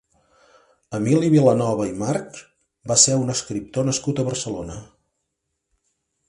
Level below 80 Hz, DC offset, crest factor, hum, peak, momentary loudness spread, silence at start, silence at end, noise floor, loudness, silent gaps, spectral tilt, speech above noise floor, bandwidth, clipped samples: -54 dBFS; under 0.1%; 22 dB; none; -2 dBFS; 20 LU; 0.9 s; 1.45 s; -78 dBFS; -20 LUFS; none; -4.5 dB/octave; 57 dB; 11.5 kHz; under 0.1%